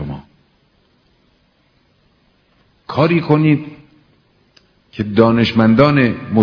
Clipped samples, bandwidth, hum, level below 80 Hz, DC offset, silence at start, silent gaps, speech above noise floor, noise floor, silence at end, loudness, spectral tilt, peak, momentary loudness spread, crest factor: 0.2%; 5.4 kHz; none; -46 dBFS; under 0.1%; 0 s; none; 45 dB; -58 dBFS; 0 s; -14 LUFS; -9 dB/octave; 0 dBFS; 19 LU; 18 dB